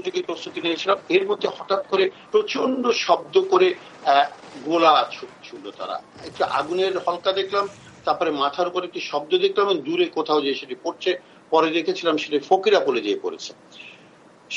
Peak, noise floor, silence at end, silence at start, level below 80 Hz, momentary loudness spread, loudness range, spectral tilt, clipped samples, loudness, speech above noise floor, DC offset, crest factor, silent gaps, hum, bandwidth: -4 dBFS; -50 dBFS; 0 s; 0 s; -72 dBFS; 13 LU; 4 LU; -4 dB/octave; under 0.1%; -22 LUFS; 28 dB; under 0.1%; 18 dB; none; none; 8.8 kHz